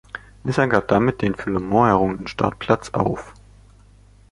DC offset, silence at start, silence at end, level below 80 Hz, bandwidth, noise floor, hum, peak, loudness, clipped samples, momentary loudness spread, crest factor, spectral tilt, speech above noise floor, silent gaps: under 0.1%; 0.15 s; 1 s; -44 dBFS; 11.5 kHz; -50 dBFS; 50 Hz at -40 dBFS; -2 dBFS; -20 LUFS; under 0.1%; 8 LU; 20 dB; -7 dB/octave; 30 dB; none